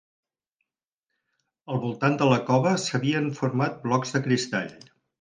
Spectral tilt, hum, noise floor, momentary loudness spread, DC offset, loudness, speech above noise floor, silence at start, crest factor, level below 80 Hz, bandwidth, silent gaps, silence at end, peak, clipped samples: -5.5 dB/octave; none; -87 dBFS; 9 LU; under 0.1%; -25 LUFS; 62 dB; 1.7 s; 20 dB; -68 dBFS; 9.8 kHz; none; 0.45 s; -6 dBFS; under 0.1%